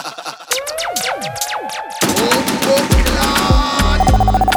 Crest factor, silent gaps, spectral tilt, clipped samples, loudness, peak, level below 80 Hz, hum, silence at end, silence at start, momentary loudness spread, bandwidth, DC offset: 14 dB; none; -4 dB/octave; under 0.1%; -15 LUFS; 0 dBFS; -20 dBFS; none; 0 s; 0 s; 8 LU; 20 kHz; under 0.1%